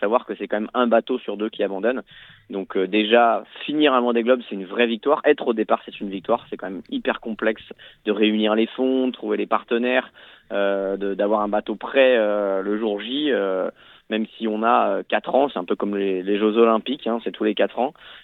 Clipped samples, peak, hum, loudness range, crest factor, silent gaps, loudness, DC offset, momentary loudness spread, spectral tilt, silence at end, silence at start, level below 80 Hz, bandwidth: under 0.1%; -2 dBFS; none; 3 LU; 20 dB; none; -22 LUFS; under 0.1%; 10 LU; -8 dB/octave; 0.05 s; 0 s; -62 dBFS; 4.2 kHz